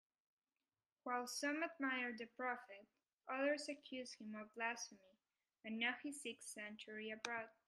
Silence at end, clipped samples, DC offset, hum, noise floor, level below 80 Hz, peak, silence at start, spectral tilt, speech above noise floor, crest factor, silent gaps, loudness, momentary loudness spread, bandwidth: 0.15 s; under 0.1%; under 0.1%; none; under -90 dBFS; under -90 dBFS; -24 dBFS; 1.05 s; -2 dB/octave; over 43 dB; 24 dB; 3.13-3.18 s; -46 LUFS; 11 LU; 13 kHz